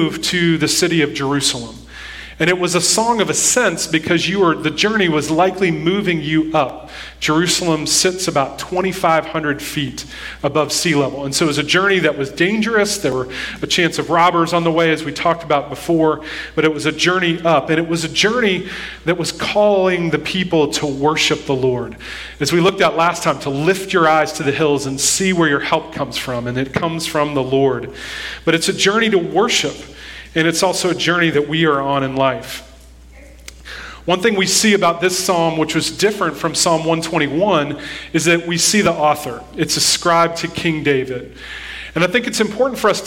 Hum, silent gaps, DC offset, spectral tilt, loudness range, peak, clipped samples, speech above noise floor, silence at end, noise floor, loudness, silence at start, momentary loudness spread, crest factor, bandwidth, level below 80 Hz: none; none; under 0.1%; -3.5 dB/octave; 2 LU; 0 dBFS; under 0.1%; 24 dB; 0 s; -41 dBFS; -16 LUFS; 0 s; 10 LU; 16 dB; 16.5 kHz; -44 dBFS